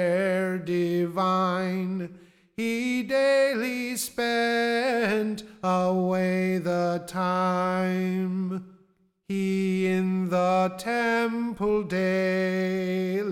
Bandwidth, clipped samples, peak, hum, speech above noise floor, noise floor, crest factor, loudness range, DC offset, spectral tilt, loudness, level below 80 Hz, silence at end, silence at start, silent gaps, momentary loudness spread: 16.5 kHz; under 0.1%; -14 dBFS; none; 39 dB; -64 dBFS; 12 dB; 2 LU; under 0.1%; -6 dB/octave; -26 LUFS; -64 dBFS; 0 s; 0 s; none; 6 LU